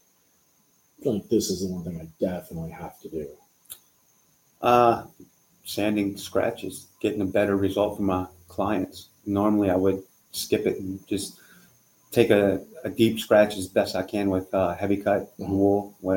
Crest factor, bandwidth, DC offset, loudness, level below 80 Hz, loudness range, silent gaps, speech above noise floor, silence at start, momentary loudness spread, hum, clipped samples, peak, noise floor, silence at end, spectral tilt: 22 dB; 17 kHz; under 0.1%; -25 LUFS; -58 dBFS; 7 LU; none; 40 dB; 1 s; 16 LU; none; under 0.1%; -4 dBFS; -64 dBFS; 0 s; -5.5 dB/octave